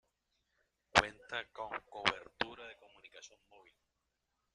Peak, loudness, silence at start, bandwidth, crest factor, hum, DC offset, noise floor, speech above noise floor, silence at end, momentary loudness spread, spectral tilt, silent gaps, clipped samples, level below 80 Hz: -8 dBFS; -36 LUFS; 0.95 s; 11.5 kHz; 32 dB; none; under 0.1%; -85 dBFS; 42 dB; 1.3 s; 25 LU; -2.5 dB/octave; none; under 0.1%; -66 dBFS